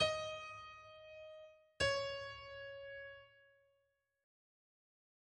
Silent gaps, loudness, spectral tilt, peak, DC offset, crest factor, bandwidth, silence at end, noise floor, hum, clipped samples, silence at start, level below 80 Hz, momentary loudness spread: none; -42 LUFS; -2.5 dB/octave; -22 dBFS; under 0.1%; 24 dB; 10 kHz; 1.75 s; -83 dBFS; none; under 0.1%; 0 s; -68 dBFS; 19 LU